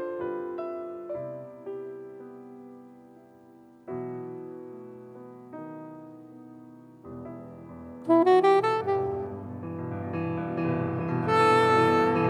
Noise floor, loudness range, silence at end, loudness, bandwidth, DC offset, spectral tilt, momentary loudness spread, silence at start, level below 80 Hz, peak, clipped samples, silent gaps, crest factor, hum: -53 dBFS; 17 LU; 0 s; -26 LUFS; 11 kHz; under 0.1%; -7 dB/octave; 26 LU; 0 s; -66 dBFS; -10 dBFS; under 0.1%; none; 18 dB; none